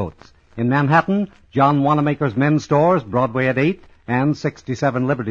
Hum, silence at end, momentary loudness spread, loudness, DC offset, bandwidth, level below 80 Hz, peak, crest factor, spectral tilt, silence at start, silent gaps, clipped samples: none; 0 s; 9 LU; -18 LUFS; under 0.1%; 7.4 kHz; -52 dBFS; -2 dBFS; 16 dB; -8 dB/octave; 0 s; none; under 0.1%